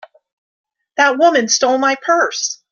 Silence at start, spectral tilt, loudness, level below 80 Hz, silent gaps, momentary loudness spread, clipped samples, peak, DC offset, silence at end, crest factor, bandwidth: 0.95 s; -1 dB/octave; -14 LUFS; -66 dBFS; none; 7 LU; under 0.1%; 0 dBFS; under 0.1%; 0.15 s; 16 dB; 7.4 kHz